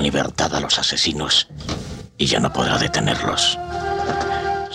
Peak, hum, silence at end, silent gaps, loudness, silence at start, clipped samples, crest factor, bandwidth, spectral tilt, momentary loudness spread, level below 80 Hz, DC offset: -6 dBFS; none; 0 s; none; -19 LUFS; 0 s; under 0.1%; 14 dB; 14 kHz; -3 dB/octave; 9 LU; -40 dBFS; under 0.1%